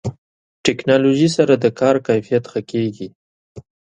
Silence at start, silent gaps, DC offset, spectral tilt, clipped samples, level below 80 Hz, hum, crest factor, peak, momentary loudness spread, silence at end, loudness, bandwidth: 0.05 s; 0.18-0.64 s, 3.15-3.55 s; under 0.1%; -6 dB/octave; under 0.1%; -54 dBFS; none; 18 dB; 0 dBFS; 11 LU; 0.4 s; -17 LUFS; 10.5 kHz